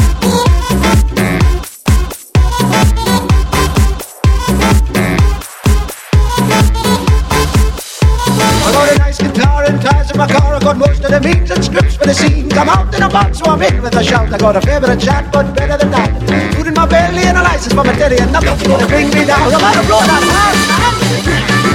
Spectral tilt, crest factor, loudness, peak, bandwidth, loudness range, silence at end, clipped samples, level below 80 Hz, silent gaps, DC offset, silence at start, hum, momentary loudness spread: -5 dB/octave; 10 dB; -11 LUFS; 0 dBFS; 17 kHz; 3 LU; 0 s; under 0.1%; -16 dBFS; none; under 0.1%; 0 s; none; 5 LU